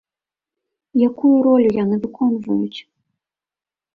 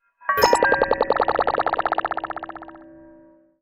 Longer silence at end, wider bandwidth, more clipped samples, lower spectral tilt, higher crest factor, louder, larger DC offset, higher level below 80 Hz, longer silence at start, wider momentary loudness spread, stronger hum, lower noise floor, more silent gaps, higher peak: first, 1.15 s vs 0.7 s; second, 4.9 kHz vs 17 kHz; neither; first, -9 dB/octave vs -3 dB/octave; second, 14 dB vs 20 dB; first, -17 LUFS vs -21 LUFS; neither; second, -60 dBFS vs -48 dBFS; first, 0.95 s vs 0.25 s; second, 10 LU vs 17 LU; neither; first, under -90 dBFS vs -51 dBFS; neither; second, -6 dBFS vs -2 dBFS